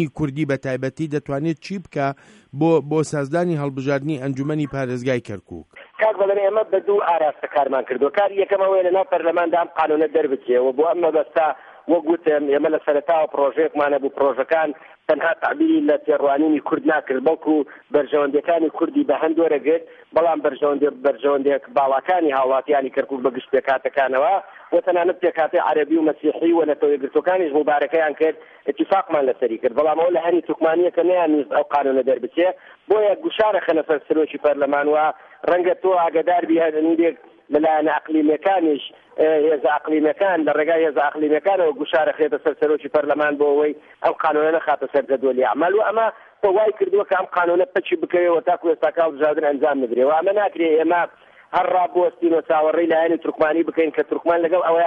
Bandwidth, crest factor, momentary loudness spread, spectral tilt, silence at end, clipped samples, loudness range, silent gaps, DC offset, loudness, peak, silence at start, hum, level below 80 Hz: 9.2 kHz; 14 dB; 6 LU; -7 dB/octave; 0 s; under 0.1%; 2 LU; none; under 0.1%; -19 LUFS; -6 dBFS; 0 s; none; -62 dBFS